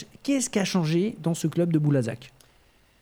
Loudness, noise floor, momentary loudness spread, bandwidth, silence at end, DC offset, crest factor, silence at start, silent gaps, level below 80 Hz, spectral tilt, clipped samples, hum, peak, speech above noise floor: -25 LUFS; -60 dBFS; 5 LU; 17 kHz; 0.75 s; under 0.1%; 16 dB; 0 s; none; -64 dBFS; -5.5 dB/octave; under 0.1%; none; -10 dBFS; 36 dB